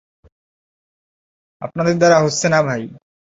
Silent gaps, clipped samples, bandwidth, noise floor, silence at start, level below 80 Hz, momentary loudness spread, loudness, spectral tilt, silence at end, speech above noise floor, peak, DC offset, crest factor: none; under 0.1%; 8 kHz; under -90 dBFS; 1.6 s; -58 dBFS; 18 LU; -16 LUFS; -5 dB/octave; 0.3 s; over 74 dB; -2 dBFS; under 0.1%; 18 dB